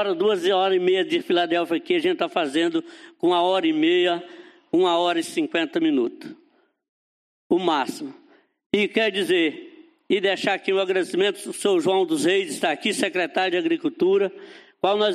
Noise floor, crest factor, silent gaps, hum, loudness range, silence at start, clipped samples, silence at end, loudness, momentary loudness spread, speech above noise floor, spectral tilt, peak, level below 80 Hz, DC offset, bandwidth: under -90 dBFS; 16 dB; 6.89-7.50 s, 8.66-8.70 s; none; 4 LU; 0 s; under 0.1%; 0 s; -22 LUFS; 6 LU; over 68 dB; -4 dB/octave; -6 dBFS; -72 dBFS; under 0.1%; 14 kHz